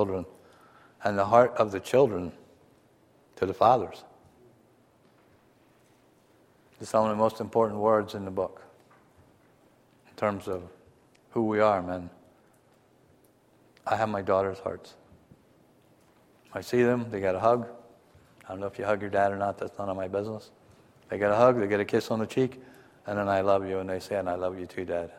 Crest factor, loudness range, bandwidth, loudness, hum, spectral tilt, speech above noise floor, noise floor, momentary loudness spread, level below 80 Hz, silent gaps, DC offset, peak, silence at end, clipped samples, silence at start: 24 dB; 6 LU; 15.5 kHz; -27 LUFS; none; -6.5 dB/octave; 35 dB; -62 dBFS; 16 LU; -66 dBFS; none; under 0.1%; -6 dBFS; 0 s; under 0.1%; 0 s